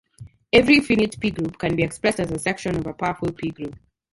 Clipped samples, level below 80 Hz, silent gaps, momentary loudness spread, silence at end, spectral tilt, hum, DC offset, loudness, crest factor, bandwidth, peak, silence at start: under 0.1%; -46 dBFS; none; 13 LU; 0.4 s; -5 dB/octave; none; under 0.1%; -21 LUFS; 20 dB; 11.5 kHz; -2 dBFS; 0.2 s